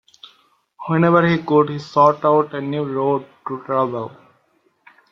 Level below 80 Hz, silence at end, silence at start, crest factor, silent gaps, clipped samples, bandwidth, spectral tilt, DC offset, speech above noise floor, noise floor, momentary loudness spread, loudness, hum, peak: -60 dBFS; 1.05 s; 0.8 s; 18 dB; none; under 0.1%; 7 kHz; -8.5 dB/octave; under 0.1%; 45 dB; -62 dBFS; 15 LU; -18 LUFS; none; -2 dBFS